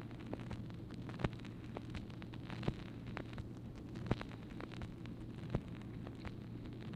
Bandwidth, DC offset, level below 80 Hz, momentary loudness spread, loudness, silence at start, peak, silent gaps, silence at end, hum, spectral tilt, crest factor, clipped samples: 11 kHz; under 0.1%; -56 dBFS; 6 LU; -47 LUFS; 0 s; -16 dBFS; none; 0 s; none; -7.5 dB/octave; 28 dB; under 0.1%